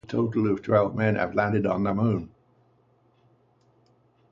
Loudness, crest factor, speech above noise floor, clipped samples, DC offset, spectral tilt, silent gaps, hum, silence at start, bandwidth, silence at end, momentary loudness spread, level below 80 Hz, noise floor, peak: -25 LUFS; 20 dB; 39 dB; under 0.1%; under 0.1%; -9.5 dB/octave; none; 60 Hz at -50 dBFS; 0.1 s; 7.2 kHz; 2.05 s; 4 LU; -56 dBFS; -63 dBFS; -8 dBFS